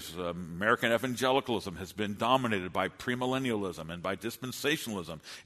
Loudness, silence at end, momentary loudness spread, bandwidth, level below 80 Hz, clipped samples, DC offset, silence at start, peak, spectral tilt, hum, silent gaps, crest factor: -32 LUFS; 0.05 s; 10 LU; 13.5 kHz; -62 dBFS; under 0.1%; under 0.1%; 0 s; -12 dBFS; -4.5 dB/octave; none; none; 20 dB